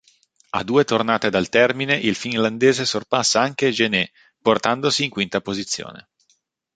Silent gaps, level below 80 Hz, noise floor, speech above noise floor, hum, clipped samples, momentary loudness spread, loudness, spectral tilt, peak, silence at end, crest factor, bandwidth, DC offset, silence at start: none; -58 dBFS; -66 dBFS; 46 dB; none; under 0.1%; 8 LU; -20 LUFS; -3.5 dB/octave; -2 dBFS; 0.75 s; 20 dB; 9.4 kHz; under 0.1%; 0.55 s